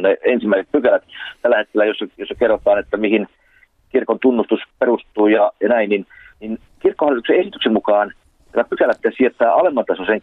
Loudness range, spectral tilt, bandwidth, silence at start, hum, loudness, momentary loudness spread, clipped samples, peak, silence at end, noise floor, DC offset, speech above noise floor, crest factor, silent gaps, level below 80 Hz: 2 LU; -7.5 dB/octave; 4.2 kHz; 0 s; none; -17 LUFS; 9 LU; under 0.1%; -4 dBFS; 0.05 s; -54 dBFS; under 0.1%; 38 dB; 12 dB; none; -54 dBFS